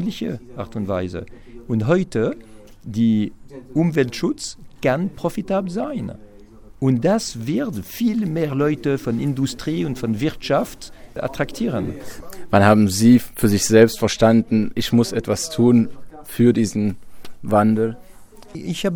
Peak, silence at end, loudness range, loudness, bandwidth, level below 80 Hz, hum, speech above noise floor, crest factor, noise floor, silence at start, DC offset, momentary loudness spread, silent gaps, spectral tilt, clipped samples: 0 dBFS; 0 s; 7 LU; -20 LUFS; 19.5 kHz; -44 dBFS; none; 24 dB; 20 dB; -43 dBFS; 0 s; under 0.1%; 17 LU; none; -6 dB/octave; under 0.1%